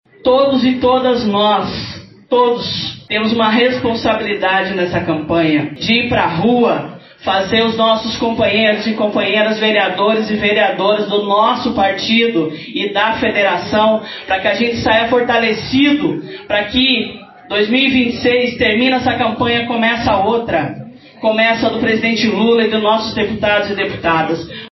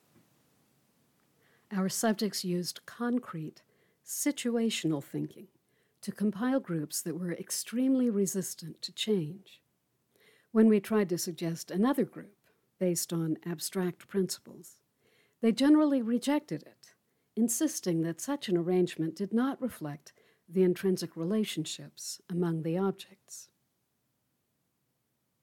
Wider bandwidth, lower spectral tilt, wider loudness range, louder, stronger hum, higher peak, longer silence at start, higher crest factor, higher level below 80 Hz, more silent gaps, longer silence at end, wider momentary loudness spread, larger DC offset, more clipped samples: second, 6.2 kHz vs 19 kHz; second, -2.5 dB/octave vs -5 dB/octave; second, 1 LU vs 5 LU; first, -14 LUFS vs -31 LUFS; neither; first, 0 dBFS vs -14 dBFS; second, 0.25 s vs 1.7 s; about the same, 14 dB vs 18 dB; first, -44 dBFS vs -80 dBFS; neither; second, 0.05 s vs 2 s; second, 6 LU vs 14 LU; neither; neither